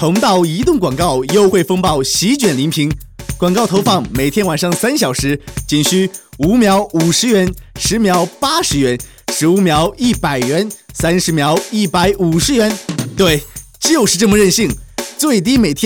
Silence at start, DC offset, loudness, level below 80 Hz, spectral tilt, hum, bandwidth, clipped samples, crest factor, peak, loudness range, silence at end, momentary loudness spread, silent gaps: 0 s; under 0.1%; -13 LUFS; -34 dBFS; -4.5 dB/octave; none; over 20 kHz; under 0.1%; 14 dB; 0 dBFS; 1 LU; 0 s; 7 LU; none